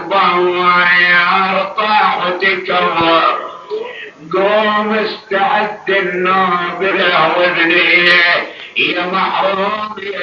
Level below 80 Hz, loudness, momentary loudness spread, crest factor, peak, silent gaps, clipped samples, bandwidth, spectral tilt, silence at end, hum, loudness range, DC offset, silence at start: -58 dBFS; -12 LUFS; 12 LU; 14 dB; 0 dBFS; none; under 0.1%; 7.2 kHz; -1 dB/octave; 0 s; none; 4 LU; under 0.1%; 0 s